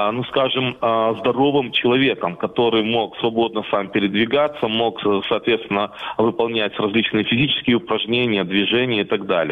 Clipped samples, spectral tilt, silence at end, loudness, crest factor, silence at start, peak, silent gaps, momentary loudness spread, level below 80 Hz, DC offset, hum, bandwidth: under 0.1%; -8 dB/octave; 0 s; -19 LUFS; 16 dB; 0 s; -4 dBFS; none; 4 LU; -56 dBFS; under 0.1%; none; 4.8 kHz